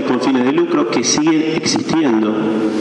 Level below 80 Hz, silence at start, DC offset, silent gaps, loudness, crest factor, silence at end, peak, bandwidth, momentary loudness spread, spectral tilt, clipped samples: -56 dBFS; 0 s; under 0.1%; none; -15 LUFS; 12 dB; 0 s; -2 dBFS; 9.8 kHz; 3 LU; -4 dB/octave; under 0.1%